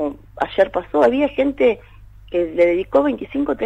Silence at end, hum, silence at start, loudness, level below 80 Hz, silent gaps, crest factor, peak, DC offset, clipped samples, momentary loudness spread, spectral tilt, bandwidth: 0 s; none; 0 s; -19 LUFS; -44 dBFS; none; 14 dB; -4 dBFS; under 0.1%; under 0.1%; 9 LU; -7 dB/octave; 8.2 kHz